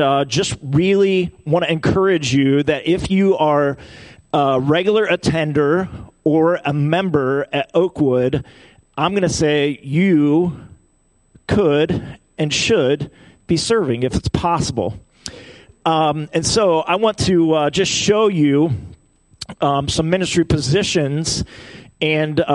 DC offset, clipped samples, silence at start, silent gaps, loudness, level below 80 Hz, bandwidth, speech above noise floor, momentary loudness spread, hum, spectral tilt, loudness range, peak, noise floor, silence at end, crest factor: under 0.1%; under 0.1%; 0 s; none; -17 LUFS; -42 dBFS; 11.5 kHz; 41 dB; 9 LU; none; -5 dB/octave; 3 LU; -2 dBFS; -58 dBFS; 0 s; 16 dB